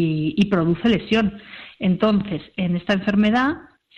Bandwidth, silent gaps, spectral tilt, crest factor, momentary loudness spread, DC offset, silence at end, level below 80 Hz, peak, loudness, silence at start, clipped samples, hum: 6.8 kHz; none; -7.5 dB/octave; 14 dB; 9 LU; under 0.1%; 0.35 s; -48 dBFS; -6 dBFS; -20 LUFS; 0 s; under 0.1%; none